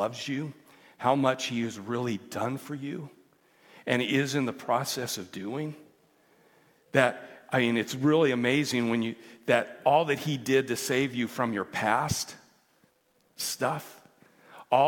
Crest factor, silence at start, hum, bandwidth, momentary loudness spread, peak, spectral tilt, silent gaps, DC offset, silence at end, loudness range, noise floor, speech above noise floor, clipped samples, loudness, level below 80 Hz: 24 dB; 0 s; none; 18 kHz; 11 LU; -4 dBFS; -4.5 dB/octave; none; under 0.1%; 0 s; 5 LU; -68 dBFS; 40 dB; under 0.1%; -28 LUFS; -68 dBFS